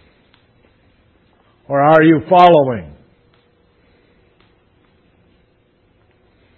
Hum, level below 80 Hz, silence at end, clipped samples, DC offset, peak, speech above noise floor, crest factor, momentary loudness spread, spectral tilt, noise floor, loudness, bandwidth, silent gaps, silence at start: none; -54 dBFS; 3.7 s; under 0.1%; under 0.1%; 0 dBFS; 47 dB; 18 dB; 12 LU; -8.5 dB/octave; -57 dBFS; -11 LUFS; 7 kHz; none; 1.7 s